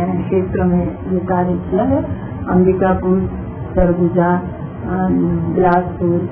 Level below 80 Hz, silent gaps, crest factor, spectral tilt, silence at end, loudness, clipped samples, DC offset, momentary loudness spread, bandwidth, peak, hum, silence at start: -32 dBFS; none; 16 dB; -13 dB/octave; 0 s; -17 LUFS; under 0.1%; under 0.1%; 9 LU; 3.4 kHz; 0 dBFS; none; 0 s